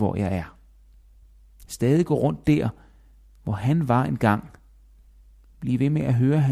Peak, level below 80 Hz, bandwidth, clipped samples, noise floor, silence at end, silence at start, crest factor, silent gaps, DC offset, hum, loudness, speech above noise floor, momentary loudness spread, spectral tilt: -6 dBFS; -48 dBFS; 14.5 kHz; under 0.1%; -52 dBFS; 0 s; 0 s; 18 dB; none; under 0.1%; none; -23 LUFS; 30 dB; 11 LU; -8 dB/octave